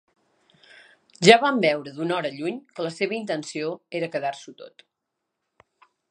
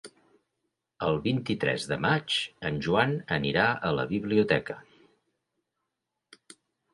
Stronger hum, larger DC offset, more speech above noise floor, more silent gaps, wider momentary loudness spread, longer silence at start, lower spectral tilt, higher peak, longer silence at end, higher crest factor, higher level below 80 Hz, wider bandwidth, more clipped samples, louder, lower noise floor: neither; neither; about the same, 58 dB vs 57 dB; neither; first, 16 LU vs 7 LU; first, 1.2 s vs 0.05 s; second, -4 dB/octave vs -5.5 dB/octave; first, 0 dBFS vs -8 dBFS; second, 1.45 s vs 2.1 s; about the same, 26 dB vs 22 dB; second, -72 dBFS vs -58 dBFS; about the same, 11 kHz vs 11.5 kHz; neither; first, -23 LUFS vs -27 LUFS; about the same, -82 dBFS vs -84 dBFS